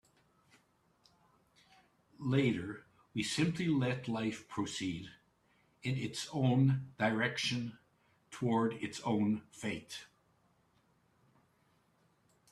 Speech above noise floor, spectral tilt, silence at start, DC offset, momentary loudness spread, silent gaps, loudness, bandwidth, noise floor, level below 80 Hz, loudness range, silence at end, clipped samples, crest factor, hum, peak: 38 dB; -5.5 dB/octave; 2.2 s; under 0.1%; 13 LU; none; -35 LUFS; 12.5 kHz; -73 dBFS; -72 dBFS; 6 LU; 2.45 s; under 0.1%; 20 dB; none; -16 dBFS